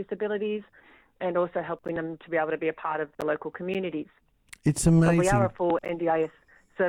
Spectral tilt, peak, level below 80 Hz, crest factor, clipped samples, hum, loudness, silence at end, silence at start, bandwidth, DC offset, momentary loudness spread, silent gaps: -6.5 dB/octave; -8 dBFS; -48 dBFS; 20 dB; under 0.1%; none; -27 LUFS; 0 s; 0 s; 14.5 kHz; under 0.1%; 12 LU; none